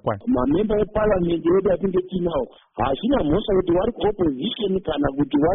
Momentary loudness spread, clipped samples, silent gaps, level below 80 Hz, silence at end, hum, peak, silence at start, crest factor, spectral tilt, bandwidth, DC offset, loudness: 5 LU; under 0.1%; none; -38 dBFS; 0 s; none; -8 dBFS; 0.05 s; 14 dB; -6 dB/octave; 3.9 kHz; under 0.1%; -21 LUFS